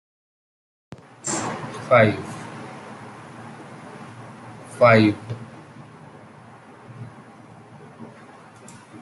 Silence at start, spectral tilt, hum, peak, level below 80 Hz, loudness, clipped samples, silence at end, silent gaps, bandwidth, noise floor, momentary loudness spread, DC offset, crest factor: 1.25 s; -5.5 dB/octave; none; -2 dBFS; -66 dBFS; -20 LUFS; under 0.1%; 0.05 s; none; 12 kHz; -45 dBFS; 28 LU; under 0.1%; 24 dB